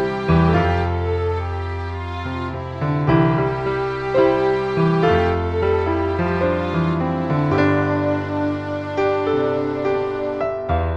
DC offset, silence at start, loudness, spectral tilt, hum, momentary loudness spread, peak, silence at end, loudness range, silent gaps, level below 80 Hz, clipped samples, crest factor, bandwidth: under 0.1%; 0 s; -20 LUFS; -8.5 dB/octave; none; 9 LU; -2 dBFS; 0 s; 3 LU; none; -36 dBFS; under 0.1%; 16 dB; 7.6 kHz